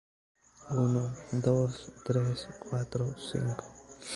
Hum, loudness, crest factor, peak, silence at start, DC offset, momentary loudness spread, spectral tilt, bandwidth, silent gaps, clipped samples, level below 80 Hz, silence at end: none; -33 LUFS; 18 dB; -14 dBFS; 0.6 s; under 0.1%; 12 LU; -7 dB/octave; 11.5 kHz; none; under 0.1%; -60 dBFS; 0 s